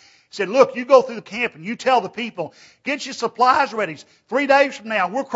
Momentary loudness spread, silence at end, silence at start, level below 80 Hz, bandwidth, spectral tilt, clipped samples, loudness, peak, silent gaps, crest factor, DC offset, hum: 13 LU; 0 s; 0.35 s; -68 dBFS; 8 kHz; -4 dB/octave; under 0.1%; -19 LUFS; 0 dBFS; none; 20 dB; under 0.1%; none